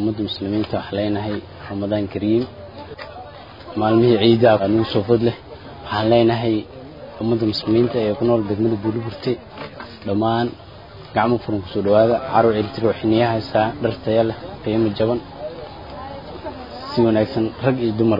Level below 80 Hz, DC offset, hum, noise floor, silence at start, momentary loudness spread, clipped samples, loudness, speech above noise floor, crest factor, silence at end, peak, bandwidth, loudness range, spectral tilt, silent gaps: -48 dBFS; 0.1%; none; -39 dBFS; 0 s; 19 LU; under 0.1%; -19 LUFS; 20 dB; 18 dB; 0 s; -2 dBFS; 5.4 kHz; 6 LU; -9 dB/octave; none